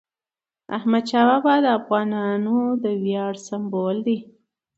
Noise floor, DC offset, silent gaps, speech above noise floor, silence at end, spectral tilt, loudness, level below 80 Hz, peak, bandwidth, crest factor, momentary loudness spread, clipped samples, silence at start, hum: under -90 dBFS; under 0.1%; none; over 69 dB; 0.55 s; -6.5 dB/octave; -21 LUFS; -72 dBFS; -4 dBFS; 8 kHz; 16 dB; 10 LU; under 0.1%; 0.7 s; none